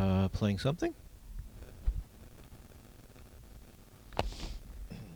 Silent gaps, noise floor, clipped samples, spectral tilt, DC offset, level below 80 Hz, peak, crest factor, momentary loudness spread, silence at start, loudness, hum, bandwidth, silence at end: none; -55 dBFS; under 0.1%; -7 dB/octave; under 0.1%; -44 dBFS; -12 dBFS; 26 dB; 24 LU; 0 s; -36 LUFS; none; over 20 kHz; 0 s